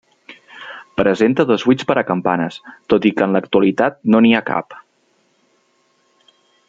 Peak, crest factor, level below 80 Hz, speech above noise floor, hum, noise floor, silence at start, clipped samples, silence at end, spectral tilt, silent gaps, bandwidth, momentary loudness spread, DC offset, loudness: -2 dBFS; 16 dB; -56 dBFS; 46 dB; none; -61 dBFS; 0.3 s; under 0.1%; 1.9 s; -7 dB/octave; none; 7.6 kHz; 18 LU; under 0.1%; -16 LUFS